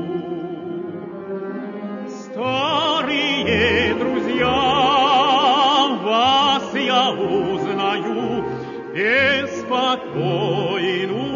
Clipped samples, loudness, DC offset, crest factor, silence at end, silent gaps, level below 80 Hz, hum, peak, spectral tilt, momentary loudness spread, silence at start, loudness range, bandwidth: under 0.1%; -18 LUFS; under 0.1%; 16 dB; 0 s; none; -50 dBFS; none; -4 dBFS; -4.5 dB/octave; 14 LU; 0 s; 5 LU; 7.4 kHz